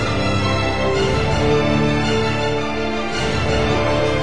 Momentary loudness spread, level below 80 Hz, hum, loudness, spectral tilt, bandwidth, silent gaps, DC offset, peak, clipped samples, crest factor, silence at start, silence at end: 4 LU; -32 dBFS; none; -18 LUFS; -5.5 dB/octave; 10.5 kHz; none; 3%; -6 dBFS; under 0.1%; 12 dB; 0 s; 0 s